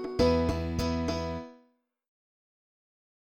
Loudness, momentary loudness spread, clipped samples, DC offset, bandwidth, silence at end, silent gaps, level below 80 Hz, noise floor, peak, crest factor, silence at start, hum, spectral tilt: -29 LUFS; 14 LU; under 0.1%; under 0.1%; 16.5 kHz; 1.7 s; none; -44 dBFS; -68 dBFS; -12 dBFS; 20 dB; 0 s; none; -6.5 dB/octave